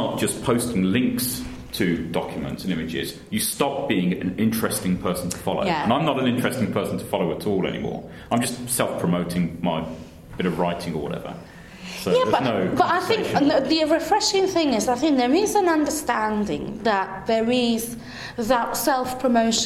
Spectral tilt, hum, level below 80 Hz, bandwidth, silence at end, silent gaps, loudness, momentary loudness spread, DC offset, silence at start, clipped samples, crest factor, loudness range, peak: -4.5 dB/octave; none; -48 dBFS; 16 kHz; 0 s; none; -23 LUFS; 10 LU; under 0.1%; 0 s; under 0.1%; 18 dB; 5 LU; -4 dBFS